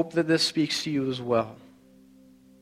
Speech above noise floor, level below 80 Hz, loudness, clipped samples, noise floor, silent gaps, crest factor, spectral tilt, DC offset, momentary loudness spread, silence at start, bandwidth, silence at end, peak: 29 dB; -66 dBFS; -26 LUFS; under 0.1%; -55 dBFS; none; 18 dB; -4.5 dB/octave; under 0.1%; 6 LU; 0 s; 15.5 kHz; 1.05 s; -10 dBFS